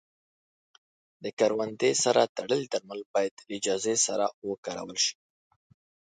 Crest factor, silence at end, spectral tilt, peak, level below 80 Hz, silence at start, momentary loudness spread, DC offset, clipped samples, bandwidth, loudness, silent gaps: 22 dB; 1.05 s; -2 dB/octave; -8 dBFS; -76 dBFS; 1.2 s; 11 LU; under 0.1%; under 0.1%; 9.6 kHz; -28 LUFS; 1.33-1.37 s, 2.29-2.35 s, 3.06-3.14 s, 3.31-3.37 s, 4.34-4.42 s, 4.58-4.63 s